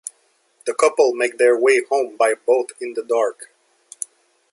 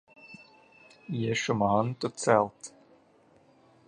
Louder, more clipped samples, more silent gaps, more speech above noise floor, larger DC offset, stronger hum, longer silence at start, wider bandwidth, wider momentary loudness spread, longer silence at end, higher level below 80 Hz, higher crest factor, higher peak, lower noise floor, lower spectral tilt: first, -19 LUFS vs -28 LUFS; neither; neither; first, 44 dB vs 34 dB; neither; neither; first, 0.65 s vs 0.25 s; about the same, 11.5 kHz vs 11.5 kHz; second, 16 LU vs 24 LU; second, 1.05 s vs 1.2 s; second, -76 dBFS vs -66 dBFS; second, 18 dB vs 24 dB; first, -2 dBFS vs -6 dBFS; about the same, -62 dBFS vs -62 dBFS; second, -1.5 dB/octave vs -5 dB/octave